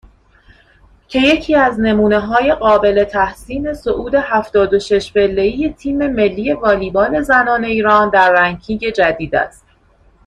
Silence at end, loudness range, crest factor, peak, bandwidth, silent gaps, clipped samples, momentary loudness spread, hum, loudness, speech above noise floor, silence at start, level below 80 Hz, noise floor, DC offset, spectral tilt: 0.75 s; 2 LU; 14 dB; 0 dBFS; 12 kHz; none; under 0.1%; 8 LU; none; -14 LUFS; 37 dB; 1.1 s; -38 dBFS; -51 dBFS; under 0.1%; -5.5 dB/octave